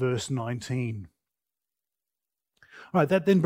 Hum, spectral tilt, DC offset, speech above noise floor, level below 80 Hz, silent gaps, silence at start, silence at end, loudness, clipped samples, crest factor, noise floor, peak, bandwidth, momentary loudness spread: none; -6.5 dB/octave; under 0.1%; 64 dB; -66 dBFS; none; 0 s; 0 s; -28 LUFS; under 0.1%; 20 dB; -89 dBFS; -8 dBFS; 16 kHz; 10 LU